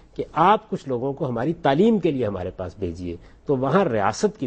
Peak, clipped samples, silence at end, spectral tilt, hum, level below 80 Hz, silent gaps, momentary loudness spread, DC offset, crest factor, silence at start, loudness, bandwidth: -4 dBFS; under 0.1%; 0 s; -6.5 dB/octave; none; -50 dBFS; none; 12 LU; under 0.1%; 18 dB; 0.2 s; -22 LUFS; 8.4 kHz